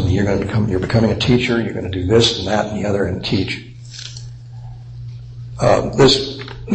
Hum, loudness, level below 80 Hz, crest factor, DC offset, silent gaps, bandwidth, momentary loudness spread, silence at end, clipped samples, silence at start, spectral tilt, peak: none; -17 LUFS; -38 dBFS; 16 dB; under 0.1%; none; 8.8 kHz; 21 LU; 0 s; under 0.1%; 0 s; -5.5 dB/octave; -2 dBFS